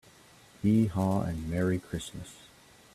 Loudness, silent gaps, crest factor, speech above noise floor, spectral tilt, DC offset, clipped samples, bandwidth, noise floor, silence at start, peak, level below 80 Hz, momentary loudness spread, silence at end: -30 LUFS; none; 16 dB; 28 dB; -7 dB/octave; under 0.1%; under 0.1%; 14 kHz; -57 dBFS; 0.65 s; -14 dBFS; -54 dBFS; 16 LU; 0.5 s